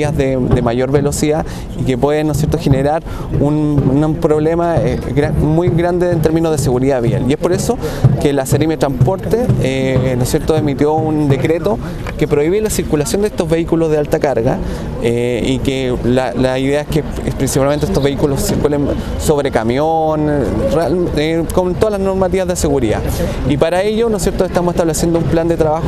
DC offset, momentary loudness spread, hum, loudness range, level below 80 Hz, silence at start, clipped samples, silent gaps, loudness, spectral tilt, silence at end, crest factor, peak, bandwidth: under 0.1%; 3 LU; none; 1 LU; -28 dBFS; 0 s; under 0.1%; none; -15 LUFS; -6.5 dB/octave; 0 s; 14 dB; 0 dBFS; 13.5 kHz